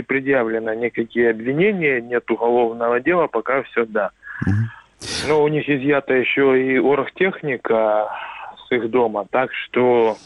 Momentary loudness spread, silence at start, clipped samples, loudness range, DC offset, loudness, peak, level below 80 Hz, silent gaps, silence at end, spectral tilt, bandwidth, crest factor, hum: 8 LU; 0 s; under 0.1%; 2 LU; under 0.1%; -19 LUFS; -4 dBFS; -56 dBFS; none; 0.1 s; -6 dB/octave; 12 kHz; 14 dB; none